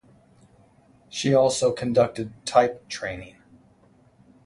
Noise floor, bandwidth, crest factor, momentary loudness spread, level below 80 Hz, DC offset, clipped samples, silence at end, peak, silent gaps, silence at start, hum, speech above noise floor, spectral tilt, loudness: -58 dBFS; 11.5 kHz; 22 dB; 13 LU; -58 dBFS; under 0.1%; under 0.1%; 1.15 s; -4 dBFS; none; 1.15 s; none; 35 dB; -4.5 dB/octave; -23 LUFS